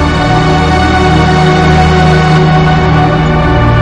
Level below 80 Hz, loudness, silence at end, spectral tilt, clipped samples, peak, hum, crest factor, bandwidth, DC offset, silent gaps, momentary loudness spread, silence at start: -18 dBFS; -7 LUFS; 0 s; -6.5 dB/octave; 0.5%; 0 dBFS; none; 6 dB; 9.4 kHz; under 0.1%; none; 2 LU; 0 s